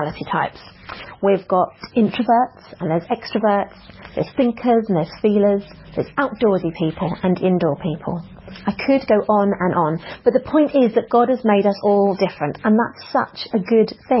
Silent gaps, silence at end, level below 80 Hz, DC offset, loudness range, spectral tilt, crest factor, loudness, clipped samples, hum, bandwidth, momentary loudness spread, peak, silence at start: none; 0 s; -50 dBFS; under 0.1%; 3 LU; -11 dB/octave; 16 dB; -19 LUFS; under 0.1%; none; 5.8 kHz; 10 LU; -4 dBFS; 0 s